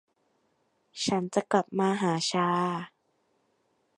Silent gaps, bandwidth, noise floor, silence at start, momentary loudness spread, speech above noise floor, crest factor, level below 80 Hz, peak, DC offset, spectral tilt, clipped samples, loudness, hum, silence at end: none; 11.5 kHz; -73 dBFS; 0.95 s; 10 LU; 45 dB; 22 dB; -72 dBFS; -8 dBFS; under 0.1%; -4.5 dB/octave; under 0.1%; -28 LUFS; none; 1.1 s